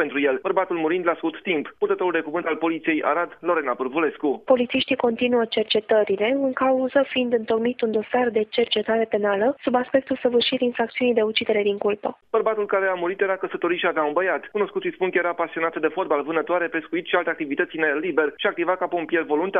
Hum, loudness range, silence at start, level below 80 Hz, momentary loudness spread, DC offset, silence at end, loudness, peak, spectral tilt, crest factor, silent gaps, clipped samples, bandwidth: none; 2 LU; 0 s; -66 dBFS; 4 LU; under 0.1%; 0 s; -23 LUFS; -6 dBFS; -8 dB/octave; 16 dB; none; under 0.1%; 5.2 kHz